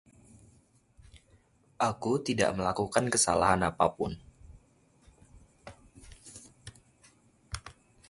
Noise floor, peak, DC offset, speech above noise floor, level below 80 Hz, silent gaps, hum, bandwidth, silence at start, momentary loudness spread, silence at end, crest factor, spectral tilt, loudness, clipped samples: -64 dBFS; -8 dBFS; under 0.1%; 36 dB; -54 dBFS; none; none; 11.5 kHz; 1.15 s; 26 LU; 0.4 s; 24 dB; -4 dB/octave; -28 LUFS; under 0.1%